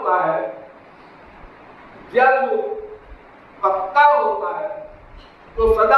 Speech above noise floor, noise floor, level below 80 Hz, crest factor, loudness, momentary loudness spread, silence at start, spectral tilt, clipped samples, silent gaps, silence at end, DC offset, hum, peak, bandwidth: 29 dB; -44 dBFS; -42 dBFS; 18 dB; -18 LUFS; 20 LU; 0 s; -6 dB/octave; under 0.1%; none; 0 s; under 0.1%; none; -2 dBFS; 12 kHz